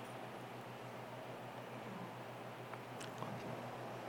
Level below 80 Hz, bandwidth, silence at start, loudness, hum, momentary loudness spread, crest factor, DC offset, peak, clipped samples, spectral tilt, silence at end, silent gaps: -82 dBFS; 19 kHz; 0 s; -49 LUFS; none; 3 LU; 20 dB; under 0.1%; -28 dBFS; under 0.1%; -5.5 dB/octave; 0 s; none